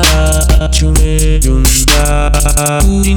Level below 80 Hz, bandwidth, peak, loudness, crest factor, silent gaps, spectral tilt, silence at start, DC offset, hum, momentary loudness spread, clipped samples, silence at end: -10 dBFS; over 20 kHz; 0 dBFS; -10 LUFS; 8 dB; none; -4 dB/octave; 0 s; under 0.1%; none; 3 LU; under 0.1%; 0 s